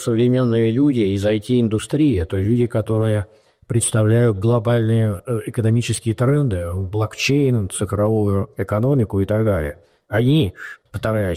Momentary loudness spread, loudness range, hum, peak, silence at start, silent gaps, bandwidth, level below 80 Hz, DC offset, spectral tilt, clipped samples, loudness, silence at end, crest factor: 8 LU; 1 LU; none; -8 dBFS; 0 s; none; 14.5 kHz; -42 dBFS; under 0.1%; -6.5 dB/octave; under 0.1%; -19 LUFS; 0 s; 10 dB